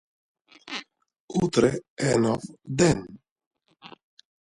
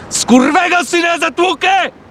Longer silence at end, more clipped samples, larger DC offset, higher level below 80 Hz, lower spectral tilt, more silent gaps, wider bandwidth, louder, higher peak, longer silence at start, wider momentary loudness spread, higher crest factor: first, 0.6 s vs 0.2 s; second, under 0.1% vs 0.1%; neither; about the same, -54 dBFS vs -50 dBFS; first, -5.5 dB/octave vs -2.5 dB/octave; first, 1.20-1.28 s, 1.90-1.97 s, 3.31-3.36 s, 3.47-3.51 s vs none; second, 11.5 kHz vs 14.5 kHz; second, -25 LUFS vs -12 LUFS; second, -6 dBFS vs 0 dBFS; first, 0.65 s vs 0 s; first, 14 LU vs 4 LU; first, 22 dB vs 12 dB